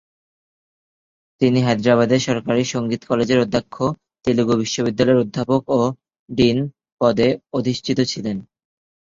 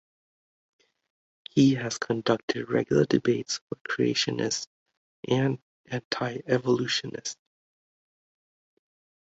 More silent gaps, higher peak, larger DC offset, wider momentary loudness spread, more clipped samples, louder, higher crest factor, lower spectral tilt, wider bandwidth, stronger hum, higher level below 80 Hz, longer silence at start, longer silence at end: second, 6.19-6.26 s, 6.92-6.97 s vs 2.43-2.48 s, 3.61-3.68 s, 3.81-3.85 s, 4.67-4.86 s, 4.97-5.23 s, 5.63-5.84 s, 6.05-6.11 s; first, -2 dBFS vs -8 dBFS; neither; second, 8 LU vs 13 LU; neither; first, -19 LUFS vs -27 LUFS; about the same, 18 dB vs 20 dB; about the same, -6 dB/octave vs -5 dB/octave; about the same, 7.6 kHz vs 8 kHz; neither; first, -52 dBFS vs -66 dBFS; second, 1.4 s vs 1.55 s; second, 0.6 s vs 1.85 s